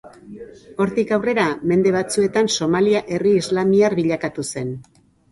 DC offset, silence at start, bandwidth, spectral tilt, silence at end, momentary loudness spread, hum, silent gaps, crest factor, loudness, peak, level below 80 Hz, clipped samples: under 0.1%; 0.05 s; 11.5 kHz; -5 dB/octave; 0.5 s; 15 LU; none; none; 14 dB; -19 LUFS; -4 dBFS; -54 dBFS; under 0.1%